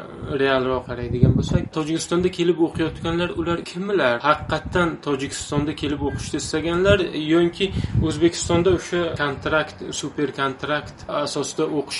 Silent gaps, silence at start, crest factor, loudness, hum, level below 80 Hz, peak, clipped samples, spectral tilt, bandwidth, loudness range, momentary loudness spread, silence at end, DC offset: none; 0 s; 20 dB; -22 LUFS; none; -40 dBFS; -2 dBFS; under 0.1%; -5.5 dB/octave; 11.5 kHz; 2 LU; 7 LU; 0 s; under 0.1%